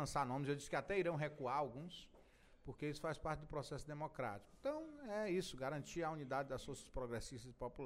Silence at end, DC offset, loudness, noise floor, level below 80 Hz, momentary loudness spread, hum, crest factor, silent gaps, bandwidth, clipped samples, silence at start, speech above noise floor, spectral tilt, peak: 0 s; under 0.1%; -45 LUFS; -67 dBFS; -62 dBFS; 10 LU; none; 18 dB; none; 16 kHz; under 0.1%; 0 s; 22 dB; -5.5 dB/octave; -26 dBFS